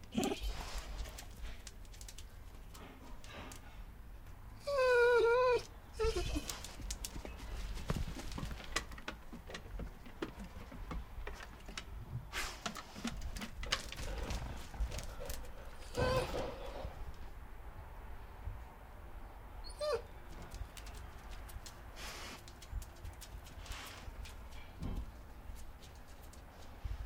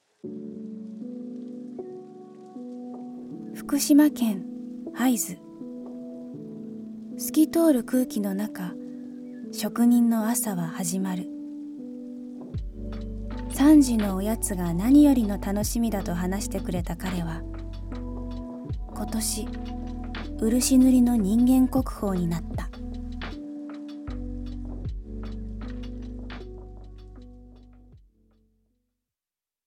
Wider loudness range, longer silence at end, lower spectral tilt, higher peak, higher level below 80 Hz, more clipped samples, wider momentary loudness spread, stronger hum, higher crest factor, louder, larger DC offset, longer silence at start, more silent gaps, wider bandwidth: about the same, 15 LU vs 16 LU; second, 0 s vs 1.7 s; about the same, -4.5 dB/octave vs -5.5 dB/octave; second, -14 dBFS vs -8 dBFS; second, -48 dBFS vs -40 dBFS; neither; second, 17 LU vs 20 LU; neither; first, 28 dB vs 18 dB; second, -41 LUFS vs -25 LUFS; neither; second, 0 s vs 0.25 s; neither; about the same, 17.5 kHz vs 17 kHz